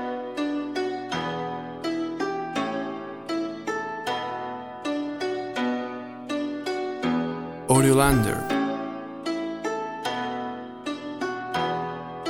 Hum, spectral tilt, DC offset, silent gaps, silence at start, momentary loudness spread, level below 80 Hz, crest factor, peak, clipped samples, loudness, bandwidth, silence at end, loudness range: none; -5 dB/octave; under 0.1%; none; 0 s; 11 LU; -48 dBFS; 22 dB; -4 dBFS; under 0.1%; -27 LUFS; 16.5 kHz; 0 s; 6 LU